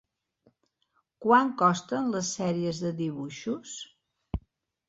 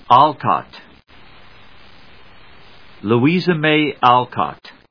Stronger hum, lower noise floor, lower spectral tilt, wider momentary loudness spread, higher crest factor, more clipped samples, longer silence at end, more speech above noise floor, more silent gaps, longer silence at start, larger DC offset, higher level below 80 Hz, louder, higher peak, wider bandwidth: neither; first, -74 dBFS vs -46 dBFS; second, -5 dB/octave vs -8 dB/octave; first, 17 LU vs 14 LU; about the same, 22 dB vs 18 dB; neither; first, 0.5 s vs 0.35 s; first, 47 dB vs 31 dB; neither; first, 1.2 s vs 0.1 s; second, under 0.1% vs 0.4%; first, -50 dBFS vs -56 dBFS; second, -28 LUFS vs -16 LUFS; second, -8 dBFS vs 0 dBFS; first, 8.2 kHz vs 5.4 kHz